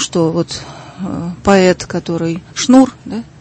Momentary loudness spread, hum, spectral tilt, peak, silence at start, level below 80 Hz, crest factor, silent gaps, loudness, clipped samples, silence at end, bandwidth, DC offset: 16 LU; none; -5 dB/octave; 0 dBFS; 0 s; -42 dBFS; 14 dB; none; -14 LUFS; under 0.1%; 0.15 s; 8.8 kHz; under 0.1%